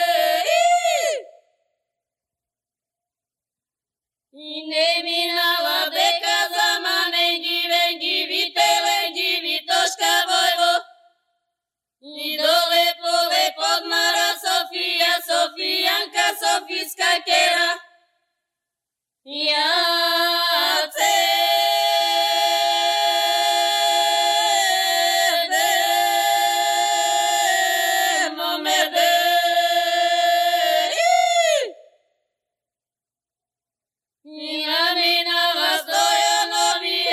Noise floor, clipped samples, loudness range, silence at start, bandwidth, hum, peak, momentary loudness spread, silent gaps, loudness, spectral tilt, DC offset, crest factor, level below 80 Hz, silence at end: under -90 dBFS; under 0.1%; 6 LU; 0 s; 16 kHz; none; -6 dBFS; 4 LU; none; -18 LUFS; 2 dB/octave; under 0.1%; 14 dB; -82 dBFS; 0 s